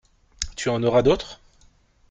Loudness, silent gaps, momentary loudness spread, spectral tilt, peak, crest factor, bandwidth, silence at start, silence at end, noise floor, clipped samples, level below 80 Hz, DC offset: -22 LUFS; none; 14 LU; -5 dB/octave; -6 dBFS; 20 dB; 9.4 kHz; 0.4 s; 0.75 s; -57 dBFS; under 0.1%; -42 dBFS; under 0.1%